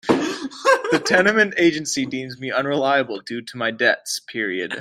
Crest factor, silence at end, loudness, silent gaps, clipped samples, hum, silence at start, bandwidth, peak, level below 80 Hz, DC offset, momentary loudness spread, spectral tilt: 18 dB; 0 s; -20 LUFS; none; under 0.1%; none; 0.05 s; 15.5 kHz; -2 dBFS; -62 dBFS; under 0.1%; 11 LU; -3.5 dB/octave